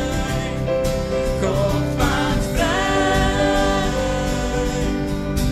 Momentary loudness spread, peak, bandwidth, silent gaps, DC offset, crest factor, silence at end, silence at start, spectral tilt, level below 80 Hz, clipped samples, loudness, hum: 5 LU; -4 dBFS; 16 kHz; none; under 0.1%; 16 dB; 0 s; 0 s; -5 dB/octave; -26 dBFS; under 0.1%; -20 LUFS; none